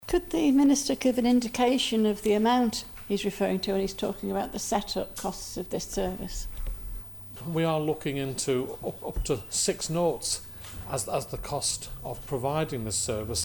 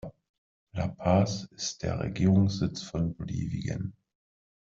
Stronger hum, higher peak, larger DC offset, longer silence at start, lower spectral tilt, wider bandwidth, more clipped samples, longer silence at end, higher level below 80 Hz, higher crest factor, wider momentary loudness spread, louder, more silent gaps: neither; about the same, -12 dBFS vs -12 dBFS; neither; about the same, 0 s vs 0.05 s; second, -4 dB/octave vs -6.5 dB/octave; first, 19 kHz vs 7.6 kHz; neither; second, 0 s vs 0.7 s; first, -44 dBFS vs -52 dBFS; about the same, 16 dB vs 18 dB; about the same, 13 LU vs 11 LU; about the same, -28 LUFS vs -29 LUFS; second, none vs 0.29-0.67 s